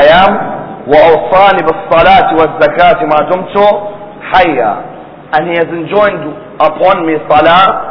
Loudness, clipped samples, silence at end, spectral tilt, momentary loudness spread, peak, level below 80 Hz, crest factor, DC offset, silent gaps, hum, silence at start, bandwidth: -8 LUFS; 3%; 0 s; -7 dB/octave; 13 LU; 0 dBFS; -36 dBFS; 8 dB; under 0.1%; none; none; 0 s; 5.4 kHz